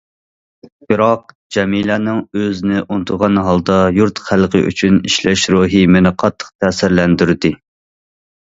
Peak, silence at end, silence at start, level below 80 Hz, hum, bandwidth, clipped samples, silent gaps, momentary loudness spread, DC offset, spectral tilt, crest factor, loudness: 0 dBFS; 0.95 s; 0.9 s; -38 dBFS; none; 8 kHz; under 0.1%; 1.35-1.50 s, 6.55-6.59 s; 8 LU; under 0.1%; -5.5 dB/octave; 14 dB; -14 LUFS